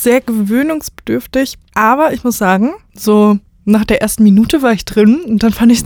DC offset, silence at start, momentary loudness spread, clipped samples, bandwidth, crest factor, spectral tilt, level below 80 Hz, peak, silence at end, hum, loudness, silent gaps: under 0.1%; 0 s; 8 LU; under 0.1%; over 20 kHz; 12 dB; -5.5 dB/octave; -36 dBFS; 0 dBFS; 0 s; none; -12 LUFS; none